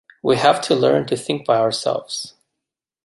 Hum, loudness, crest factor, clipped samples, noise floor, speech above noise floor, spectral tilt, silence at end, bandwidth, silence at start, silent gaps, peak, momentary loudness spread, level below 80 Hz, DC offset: none; -19 LUFS; 18 dB; under 0.1%; -83 dBFS; 65 dB; -4.5 dB/octave; 0.75 s; 11.5 kHz; 0.25 s; none; -2 dBFS; 12 LU; -62 dBFS; under 0.1%